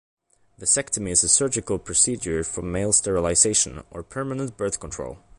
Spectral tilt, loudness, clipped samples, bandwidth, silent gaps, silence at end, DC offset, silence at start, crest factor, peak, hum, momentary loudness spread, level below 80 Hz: -2.5 dB/octave; -21 LUFS; under 0.1%; 11.5 kHz; none; 0.2 s; under 0.1%; 0.6 s; 20 dB; -4 dBFS; none; 13 LU; -46 dBFS